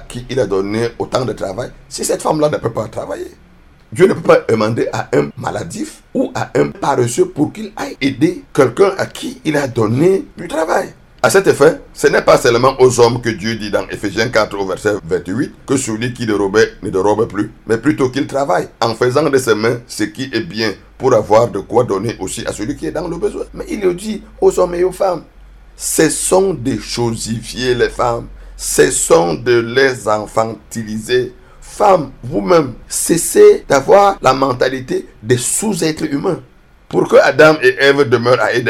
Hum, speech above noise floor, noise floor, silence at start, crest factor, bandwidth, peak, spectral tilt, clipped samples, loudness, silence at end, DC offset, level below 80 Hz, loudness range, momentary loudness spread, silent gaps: none; 27 dB; -41 dBFS; 0 s; 14 dB; 15.5 kHz; 0 dBFS; -4.5 dB/octave; 0.1%; -14 LUFS; 0 s; under 0.1%; -40 dBFS; 5 LU; 12 LU; none